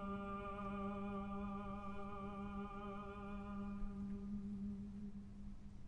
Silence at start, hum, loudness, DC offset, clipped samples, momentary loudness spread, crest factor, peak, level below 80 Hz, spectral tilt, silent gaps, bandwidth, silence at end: 0 s; none; -48 LUFS; under 0.1%; under 0.1%; 6 LU; 14 dB; -34 dBFS; -56 dBFS; -8.5 dB/octave; none; 8.4 kHz; 0 s